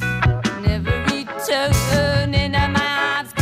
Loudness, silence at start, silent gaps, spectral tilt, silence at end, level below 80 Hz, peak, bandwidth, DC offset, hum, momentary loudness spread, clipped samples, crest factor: -19 LUFS; 0 s; none; -5 dB/octave; 0 s; -30 dBFS; -6 dBFS; 16 kHz; under 0.1%; none; 4 LU; under 0.1%; 14 dB